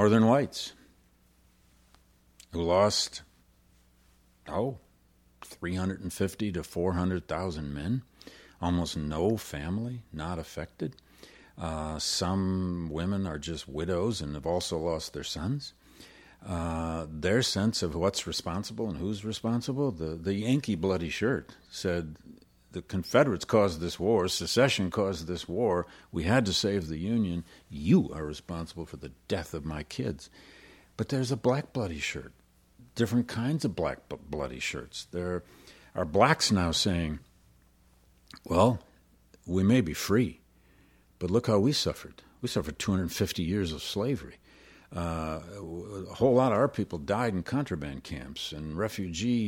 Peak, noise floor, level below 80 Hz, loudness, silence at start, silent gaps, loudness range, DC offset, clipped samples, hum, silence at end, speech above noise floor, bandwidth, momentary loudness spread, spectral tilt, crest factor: -6 dBFS; -64 dBFS; -50 dBFS; -30 LUFS; 0 s; none; 6 LU; under 0.1%; under 0.1%; none; 0 s; 34 dB; 17 kHz; 14 LU; -5.5 dB/octave; 24 dB